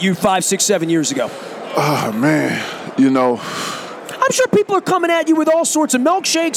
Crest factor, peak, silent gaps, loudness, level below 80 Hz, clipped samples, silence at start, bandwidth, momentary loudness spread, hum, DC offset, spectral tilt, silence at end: 14 dB; -2 dBFS; none; -16 LUFS; -60 dBFS; under 0.1%; 0 s; 17 kHz; 9 LU; none; under 0.1%; -3.5 dB/octave; 0 s